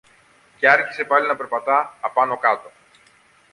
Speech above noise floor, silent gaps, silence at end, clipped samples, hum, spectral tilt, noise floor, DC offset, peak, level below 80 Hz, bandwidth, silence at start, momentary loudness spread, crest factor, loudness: 36 dB; none; 0.85 s; under 0.1%; none; -4 dB/octave; -55 dBFS; under 0.1%; -2 dBFS; -72 dBFS; 11.5 kHz; 0.6 s; 8 LU; 20 dB; -19 LUFS